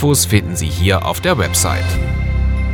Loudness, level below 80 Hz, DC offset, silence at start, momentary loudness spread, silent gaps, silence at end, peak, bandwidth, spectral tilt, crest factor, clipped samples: -16 LUFS; -22 dBFS; under 0.1%; 0 s; 5 LU; none; 0 s; 0 dBFS; 19 kHz; -4 dB/octave; 14 dB; under 0.1%